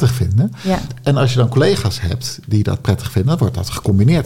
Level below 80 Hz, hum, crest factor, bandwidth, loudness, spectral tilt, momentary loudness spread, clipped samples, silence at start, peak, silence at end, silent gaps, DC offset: -38 dBFS; none; 12 dB; 16 kHz; -17 LUFS; -6.5 dB/octave; 7 LU; under 0.1%; 0 s; -4 dBFS; 0 s; none; 0.7%